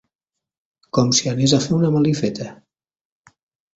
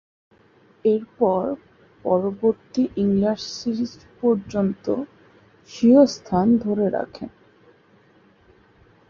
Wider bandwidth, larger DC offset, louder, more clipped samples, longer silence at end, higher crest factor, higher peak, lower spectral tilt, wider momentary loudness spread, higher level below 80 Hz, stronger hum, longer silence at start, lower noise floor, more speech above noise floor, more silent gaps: first, 8 kHz vs 7.2 kHz; neither; first, -18 LUFS vs -22 LUFS; neither; second, 1.2 s vs 1.8 s; about the same, 18 dB vs 20 dB; about the same, -2 dBFS vs -4 dBFS; second, -5 dB/octave vs -7 dB/octave; second, 10 LU vs 15 LU; about the same, -54 dBFS vs -56 dBFS; neither; about the same, 0.95 s vs 0.85 s; first, -84 dBFS vs -56 dBFS; first, 67 dB vs 35 dB; neither